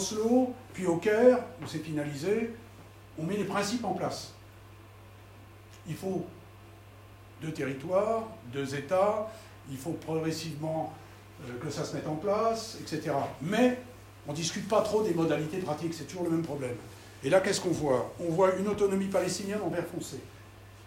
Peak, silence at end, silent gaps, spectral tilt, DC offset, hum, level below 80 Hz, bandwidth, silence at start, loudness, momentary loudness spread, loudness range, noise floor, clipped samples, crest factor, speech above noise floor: -10 dBFS; 0 s; none; -5.5 dB/octave; under 0.1%; none; -62 dBFS; 16 kHz; 0 s; -31 LUFS; 18 LU; 7 LU; -51 dBFS; under 0.1%; 22 dB; 21 dB